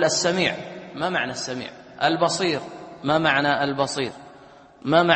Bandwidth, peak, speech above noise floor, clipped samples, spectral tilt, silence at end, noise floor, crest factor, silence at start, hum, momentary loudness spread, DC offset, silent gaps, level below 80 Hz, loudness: 8.8 kHz; -2 dBFS; 26 dB; under 0.1%; -3.5 dB/octave; 0 s; -48 dBFS; 20 dB; 0 s; none; 14 LU; under 0.1%; none; -60 dBFS; -23 LUFS